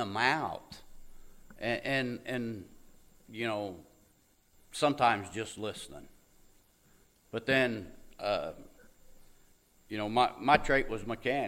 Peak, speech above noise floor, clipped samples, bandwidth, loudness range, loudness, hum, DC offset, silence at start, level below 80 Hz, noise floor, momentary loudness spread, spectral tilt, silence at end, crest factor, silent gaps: -6 dBFS; 35 dB; under 0.1%; 16 kHz; 5 LU; -32 LUFS; none; under 0.1%; 0 s; -54 dBFS; -67 dBFS; 20 LU; -4.5 dB/octave; 0 s; 28 dB; none